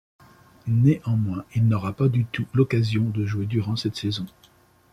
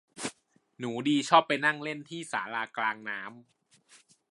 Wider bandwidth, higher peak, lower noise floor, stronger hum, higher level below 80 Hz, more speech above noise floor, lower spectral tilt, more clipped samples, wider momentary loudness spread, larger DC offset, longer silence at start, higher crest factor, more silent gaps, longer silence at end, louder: about the same, 11.5 kHz vs 11.5 kHz; about the same, -6 dBFS vs -6 dBFS; second, -57 dBFS vs -61 dBFS; neither; first, -56 dBFS vs -80 dBFS; about the same, 34 dB vs 32 dB; first, -8 dB/octave vs -3.5 dB/octave; neither; second, 8 LU vs 16 LU; neither; first, 0.65 s vs 0.15 s; second, 16 dB vs 26 dB; neither; second, 0.65 s vs 0.9 s; first, -24 LUFS vs -29 LUFS